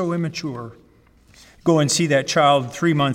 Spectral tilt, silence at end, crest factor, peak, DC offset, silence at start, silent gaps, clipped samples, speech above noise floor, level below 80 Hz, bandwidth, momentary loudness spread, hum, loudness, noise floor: -4.5 dB/octave; 0 s; 16 dB; -4 dBFS; under 0.1%; 0 s; none; under 0.1%; 34 dB; -56 dBFS; 16.5 kHz; 14 LU; none; -19 LUFS; -53 dBFS